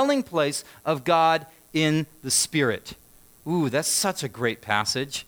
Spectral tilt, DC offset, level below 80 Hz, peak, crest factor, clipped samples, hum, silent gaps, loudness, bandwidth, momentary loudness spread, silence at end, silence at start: -3.5 dB/octave; under 0.1%; -62 dBFS; -6 dBFS; 20 dB; under 0.1%; none; none; -24 LUFS; over 20 kHz; 9 LU; 0.05 s; 0 s